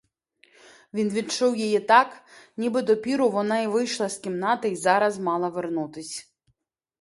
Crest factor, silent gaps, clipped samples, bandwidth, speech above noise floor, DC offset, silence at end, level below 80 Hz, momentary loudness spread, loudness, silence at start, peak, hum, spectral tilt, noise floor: 22 dB; none; under 0.1%; 11.5 kHz; 49 dB; under 0.1%; 0.8 s; -72 dBFS; 13 LU; -24 LUFS; 0.95 s; -4 dBFS; none; -4 dB/octave; -73 dBFS